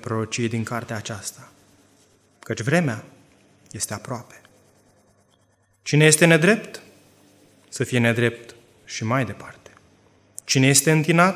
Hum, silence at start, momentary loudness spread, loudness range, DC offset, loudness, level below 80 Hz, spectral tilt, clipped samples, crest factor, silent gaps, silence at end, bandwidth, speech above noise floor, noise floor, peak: 50 Hz at -50 dBFS; 0.05 s; 23 LU; 9 LU; under 0.1%; -20 LUFS; -60 dBFS; -4.5 dB/octave; under 0.1%; 22 dB; none; 0 s; 16 kHz; 42 dB; -63 dBFS; 0 dBFS